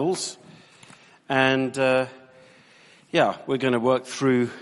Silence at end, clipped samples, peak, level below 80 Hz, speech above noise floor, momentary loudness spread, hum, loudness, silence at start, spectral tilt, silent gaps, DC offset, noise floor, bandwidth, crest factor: 0 s; under 0.1%; -4 dBFS; -66 dBFS; 31 dB; 9 LU; none; -23 LUFS; 0 s; -5 dB/octave; none; under 0.1%; -54 dBFS; 11.5 kHz; 20 dB